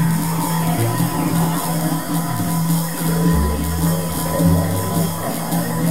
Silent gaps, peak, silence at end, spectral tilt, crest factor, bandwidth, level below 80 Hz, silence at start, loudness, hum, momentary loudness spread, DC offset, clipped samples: none; -4 dBFS; 0 s; -5.5 dB/octave; 14 dB; 16.5 kHz; -34 dBFS; 0 s; -19 LUFS; none; 4 LU; 2%; under 0.1%